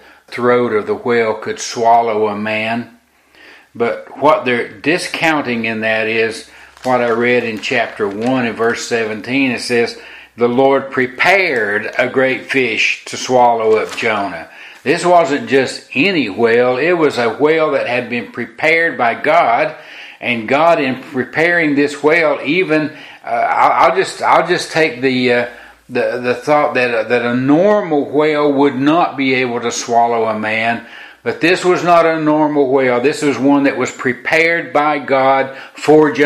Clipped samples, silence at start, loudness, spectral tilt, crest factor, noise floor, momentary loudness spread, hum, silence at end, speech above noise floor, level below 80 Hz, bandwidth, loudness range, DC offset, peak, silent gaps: under 0.1%; 0.3 s; -14 LUFS; -4.5 dB/octave; 14 dB; -47 dBFS; 8 LU; none; 0 s; 33 dB; -60 dBFS; 14 kHz; 3 LU; under 0.1%; 0 dBFS; none